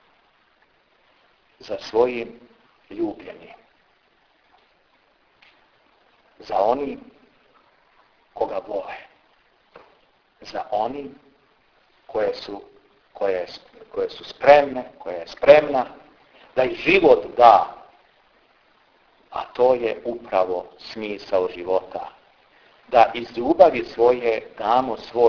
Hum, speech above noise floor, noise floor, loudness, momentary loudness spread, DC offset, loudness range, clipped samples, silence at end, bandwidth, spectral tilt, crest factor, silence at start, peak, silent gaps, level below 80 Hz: none; 42 dB; -62 dBFS; -20 LUFS; 21 LU; under 0.1%; 15 LU; under 0.1%; 0 s; 5.4 kHz; -6 dB/octave; 22 dB; 1.65 s; 0 dBFS; none; -58 dBFS